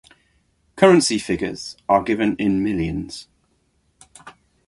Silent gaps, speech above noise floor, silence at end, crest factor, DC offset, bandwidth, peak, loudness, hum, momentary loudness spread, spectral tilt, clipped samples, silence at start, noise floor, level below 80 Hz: none; 46 dB; 0.4 s; 20 dB; under 0.1%; 11.5 kHz; -2 dBFS; -19 LUFS; none; 16 LU; -5 dB/octave; under 0.1%; 0.75 s; -65 dBFS; -46 dBFS